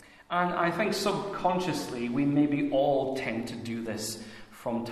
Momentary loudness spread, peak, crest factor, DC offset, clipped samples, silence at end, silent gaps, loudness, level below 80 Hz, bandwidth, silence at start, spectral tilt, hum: 10 LU; -12 dBFS; 16 dB; under 0.1%; under 0.1%; 0 s; none; -29 LUFS; -60 dBFS; 14 kHz; 0.3 s; -5 dB/octave; none